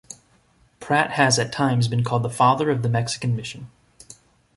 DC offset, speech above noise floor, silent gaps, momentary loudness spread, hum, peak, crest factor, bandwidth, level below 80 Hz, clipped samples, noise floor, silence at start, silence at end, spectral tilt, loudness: under 0.1%; 38 dB; none; 16 LU; none; -2 dBFS; 20 dB; 11.5 kHz; -56 dBFS; under 0.1%; -59 dBFS; 0.1 s; 0.45 s; -5 dB/octave; -21 LUFS